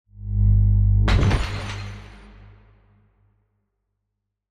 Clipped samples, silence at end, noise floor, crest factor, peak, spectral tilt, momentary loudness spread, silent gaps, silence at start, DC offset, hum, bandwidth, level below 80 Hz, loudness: under 0.1%; 2.45 s; -80 dBFS; 14 dB; -8 dBFS; -7 dB/octave; 16 LU; none; 0.2 s; under 0.1%; none; 9.8 kHz; -26 dBFS; -21 LUFS